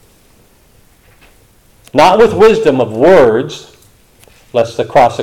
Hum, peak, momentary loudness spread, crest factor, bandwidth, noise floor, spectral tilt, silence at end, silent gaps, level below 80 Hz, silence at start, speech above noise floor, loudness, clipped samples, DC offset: none; 0 dBFS; 11 LU; 12 dB; 15.5 kHz; -47 dBFS; -5.5 dB/octave; 0 s; none; -42 dBFS; 1.95 s; 38 dB; -9 LUFS; under 0.1%; under 0.1%